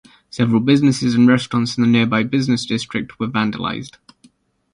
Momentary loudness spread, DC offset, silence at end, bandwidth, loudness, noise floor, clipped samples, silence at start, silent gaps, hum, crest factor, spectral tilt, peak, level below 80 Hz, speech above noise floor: 11 LU; under 0.1%; 0.85 s; 11 kHz; -17 LUFS; -54 dBFS; under 0.1%; 0.35 s; none; none; 16 dB; -6 dB/octave; -2 dBFS; -52 dBFS; 38 dB